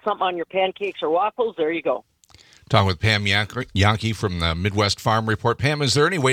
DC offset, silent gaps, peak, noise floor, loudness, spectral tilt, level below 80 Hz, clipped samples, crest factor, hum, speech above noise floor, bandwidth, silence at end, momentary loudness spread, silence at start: under 0.1%; none; 0 dBFS; -52 dBFS; -21 LUFS; -5 dB/octave; -48 dBFS; under 0.1%; 22 dB; none; 31 dB; 15.5 kHz; 0 s; 6 LU; 0.05 s